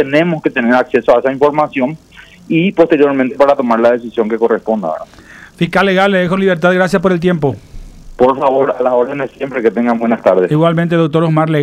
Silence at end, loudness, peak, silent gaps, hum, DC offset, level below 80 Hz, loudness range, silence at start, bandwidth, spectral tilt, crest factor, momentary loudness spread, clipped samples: 0 s; -13 LUFS; 0 dBFS; none; none; under 0.1%; -42 dBFS; 1 LU; 0 s; 12.5 kHz; -7.5 dB/octave; 12 dB; 7 LU; under 0.1%